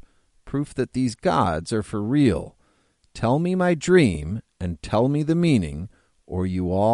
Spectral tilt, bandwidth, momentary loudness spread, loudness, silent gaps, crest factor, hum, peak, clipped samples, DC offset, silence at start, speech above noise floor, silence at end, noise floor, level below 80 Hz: -7 dB/octave; 11.5 kHz; 14 LU; -23 LUFS; none; 18 dB; none; -4 dBFS; under 0.1%; under 0.1%; 0.45 s; 42 dB; 0 s; -64 dBFS; -44 dBFS